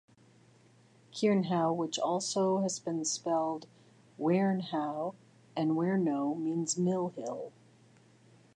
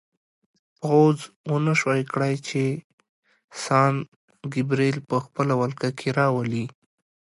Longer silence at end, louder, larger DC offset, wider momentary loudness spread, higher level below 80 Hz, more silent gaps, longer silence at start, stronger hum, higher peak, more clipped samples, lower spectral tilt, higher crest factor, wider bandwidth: first, 1.05 s vs 0.55 s; second, -32 LUFS vs -24 LUFS; neither; about the same, 11 LU vs 13 LU; second, -84 dBFS vs -68 dBFS; second, none vs 1.36-1.44 s, 2.84-2.98 s, 3.09-3.23 s, 3.44-3.48 s, 4.08-4.28 s; first, 1.15 s vs 0.8 s; neither; second, -18 dBFS vs -6 dBFS; neither; second, -5 dB/octave vs -6.5 dB/octave; about the same, 16 dB vs 18 dB; about the same, 11 kHz vs 11.5 kHz